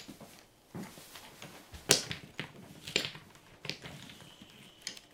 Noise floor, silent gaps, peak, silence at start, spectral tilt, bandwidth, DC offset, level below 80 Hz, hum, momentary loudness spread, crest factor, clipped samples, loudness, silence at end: -58 dBFS; none; 0 dBFS; 0 s; -1.5 dB/octave; 17 kHz; under 0.1%; -66 dBFS; none; 25 LU; 40 dB; under 0.1%; -35 LUFS; 0 s